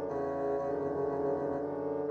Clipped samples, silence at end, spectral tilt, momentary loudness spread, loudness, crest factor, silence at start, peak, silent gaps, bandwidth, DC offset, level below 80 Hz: under 0.1%; 0 s; -9.5 dB/octave; 2 LU; -34 LUFS; 12 dB; 0 s; -22 dBFS; none; 6.6 kHz; under 0.1%; -64 dBFS